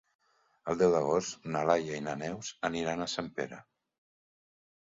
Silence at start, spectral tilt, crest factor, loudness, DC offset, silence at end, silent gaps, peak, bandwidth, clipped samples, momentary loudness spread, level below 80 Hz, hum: 0.65 s; -4.5 dB/octave; 22 dB; -32 LUFS; under 0.1%; 1.25 s; none; -12 dBFS; 7.8 kHz; under 0.1%; 12 LU; -66 dBFS; none